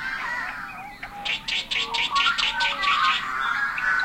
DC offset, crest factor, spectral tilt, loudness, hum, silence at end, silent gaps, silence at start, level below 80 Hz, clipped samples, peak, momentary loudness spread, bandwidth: under 0.1%; 18 dB; 0 dB/octave; -23 LUFS; none; 0 s; none; 0 s; -52 dBFS; under 0.1%; -8 dBFS; 12 LU; 16.5 kHz